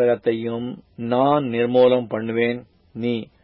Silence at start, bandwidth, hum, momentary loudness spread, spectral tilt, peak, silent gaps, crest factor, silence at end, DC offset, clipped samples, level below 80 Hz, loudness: 0 s; 5.2 kHz; none; 16 LU; -11.5 dB/octave; -6 dBFS; none; 16 dB; 0.2 s; under 0.1%; under 0.1%; -62 dBFS; -21 LUFS